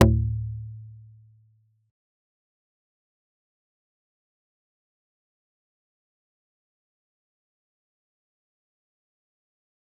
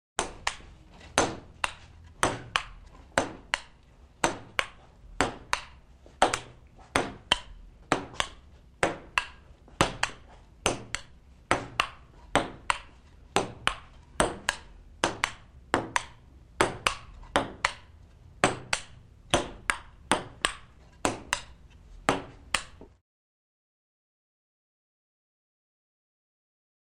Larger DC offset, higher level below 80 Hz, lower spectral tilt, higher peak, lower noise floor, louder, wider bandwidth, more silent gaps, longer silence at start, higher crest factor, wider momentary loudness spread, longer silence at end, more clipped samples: neither; first, -42 dBFS vs -50 dBFS; first, -6.5 dB/octave vs -2.5 dB/octave; about the same, -2 dBFS vs -4 dBFS; first, -64 dBFS vs -55 dBFS; first, -27 LUFS vs -30 LUFS; second, 0.6 kHz vs 15.5 kHz; neither; second, 0 s vs 0.2 s; about the same, 32 dB vs 28 dB; first, 24 LU vs 13 LU; first, 9.05 s vs 4 s; neither